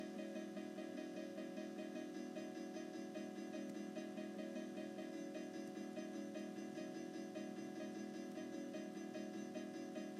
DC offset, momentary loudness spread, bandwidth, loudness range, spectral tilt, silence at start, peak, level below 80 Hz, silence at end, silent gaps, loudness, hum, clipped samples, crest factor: under 0.1%; 1 LU; 15 kHz; 0 LU; -5.5 dB/octave; 0 s; -36 dBFS; under -90 dBFS; 0 s; none; -50 LUFS; none; under 0.1%; 12 dB